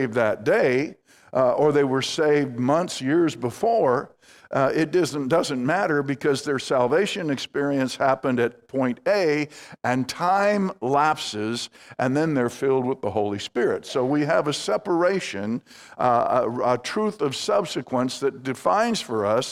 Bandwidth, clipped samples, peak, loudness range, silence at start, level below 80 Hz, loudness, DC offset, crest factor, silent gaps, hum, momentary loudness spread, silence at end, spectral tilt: 15 kHz; under 0.1%; -4 dBFS; 2 LU; 0 s; -66 dBFS; -23 LUFS; under 0.1%; 18 dB; none; none; 6 LU; 0 s; -5 dB/octave